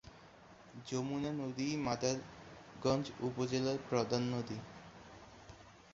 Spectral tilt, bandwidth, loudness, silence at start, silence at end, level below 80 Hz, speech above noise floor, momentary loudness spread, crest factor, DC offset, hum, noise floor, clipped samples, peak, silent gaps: -5.5 dB/octave; 7.6 kHz; -38 LUFS; 0.05 s; 0 s; -66 dBFS; 22 dB; 21 LU; 22 dB; under 0.1%; none; -59 dBFS; under 0.1%; -18 dBFS; none